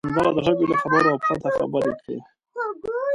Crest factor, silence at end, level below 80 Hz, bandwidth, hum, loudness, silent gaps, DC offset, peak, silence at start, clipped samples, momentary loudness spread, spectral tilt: 18 dB; 0 s; -54 dBFS; 11.5 kHz; none; -22 LUFS; none; under 0.1%; -6 dBFS; 0.05 s; under 0.1%; 15 LU; -7 dB/octave